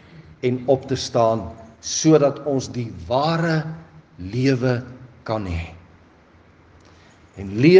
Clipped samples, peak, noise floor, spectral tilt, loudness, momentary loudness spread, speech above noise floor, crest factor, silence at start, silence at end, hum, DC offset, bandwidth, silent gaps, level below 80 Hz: under 0.1%; 0 dBFS; -52 dBFS; -5.5 dB/octave; -21 LUFS; 19 LU; 32 dB; 20 dB; 0.15 s; 0 s; none; under 0.1%; 9.6 kHz; none; -52 dBFS